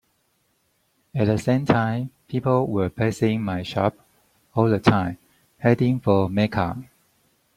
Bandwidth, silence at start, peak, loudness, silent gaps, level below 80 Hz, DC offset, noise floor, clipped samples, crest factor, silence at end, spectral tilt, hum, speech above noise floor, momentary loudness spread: 14 kHz; 1.15 s; -2 dBFS; -22 LUFS; none; -54 dBFS; under 0.1%; -68 dBFS; under 0.1%; 22 dB; 0.75 s; -7.5 dB/octave; none; 47 dB; 10 LU